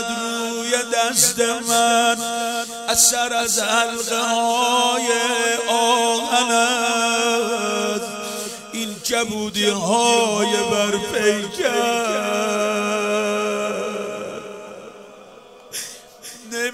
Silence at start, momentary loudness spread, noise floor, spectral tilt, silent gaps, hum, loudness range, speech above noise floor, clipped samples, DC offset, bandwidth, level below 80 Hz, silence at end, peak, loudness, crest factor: 0 s; 13 LU; -44 dBFS; -1.5 dB/octave; none; none; 6 LU; 24 dB; under 0.1%; under 0.1%; 16 kHz; -60 dBFS; 0 s; 0 dBFS; -19 LUFS; 20 dB